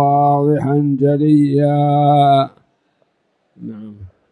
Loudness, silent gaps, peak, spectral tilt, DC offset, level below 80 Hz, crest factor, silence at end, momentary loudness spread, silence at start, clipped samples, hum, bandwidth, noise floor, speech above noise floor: -14 LUFS; none; -2 dBFS; -9.5 dB/octave; under 0.1%; -54 dBFS; 12 dB; 0.25 s; 20 LU; 0 s; under 0.1%; none; 9.6 kHz; -65 dBFS; 51 dB